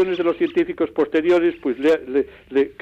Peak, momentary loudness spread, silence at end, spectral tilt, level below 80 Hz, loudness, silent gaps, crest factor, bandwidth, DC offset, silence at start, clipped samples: -8 dBFS; 6 LU; 0.1 s; -6.5 dB/octave; -56 dBFS; -20 LUFS; none; 10 dB; 8 kHz; under 0.1%; 0 s; under 0.1%